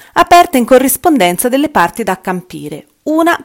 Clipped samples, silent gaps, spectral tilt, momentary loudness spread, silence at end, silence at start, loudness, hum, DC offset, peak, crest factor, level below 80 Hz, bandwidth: 2%; none; -4 dB/octave; 17 LU; 0 s; 0.15 s; -10 LUFS; none; under 0.1%; 0 dBFS; 12 dB; -42 dBFS; over 20 kHz